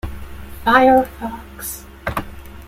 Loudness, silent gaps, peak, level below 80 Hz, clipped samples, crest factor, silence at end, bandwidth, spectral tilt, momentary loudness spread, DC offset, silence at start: -17 LUFS; none; -2 dBFS; -36 dBFS; under 0.1%; 18 dB; 0 s; 16.5 kHz; -5 dB/octave; 23 LU; under 0.1%; 0.05 s